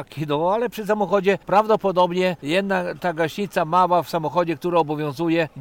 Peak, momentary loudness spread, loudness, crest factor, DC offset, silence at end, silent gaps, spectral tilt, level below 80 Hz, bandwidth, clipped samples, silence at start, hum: -6 dBFS; 6 LU; -21 LUFS; 14 dB; under 0.1%; 0 s; none; -6 dB/octave; -58 dBFS; 17 kHz; under 0.1%; 0 s; none